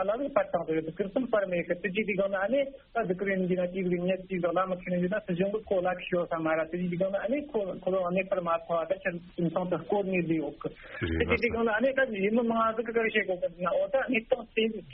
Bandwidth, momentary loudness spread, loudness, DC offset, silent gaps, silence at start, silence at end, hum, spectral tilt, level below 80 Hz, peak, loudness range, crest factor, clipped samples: 4.2 kHz; 5 LU; -30 LUFS; under 0.1%; none; 0 s; 0 s; none; -5 dB/octave; -54 dBFS; -12 dBFS; 2 LU; 18 dB; under 0.1%